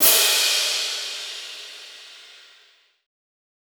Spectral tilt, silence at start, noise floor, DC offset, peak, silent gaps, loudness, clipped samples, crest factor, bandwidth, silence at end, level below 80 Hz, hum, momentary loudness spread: 3.5 dB/octave; 0 s; -57 dBFS; under 0.1%; -2 dBFS; none; -19 LUFS; under 0.1%; 22 dB; over 20 kHz; 1.35 s; under -90 dBFS; none; 25 LU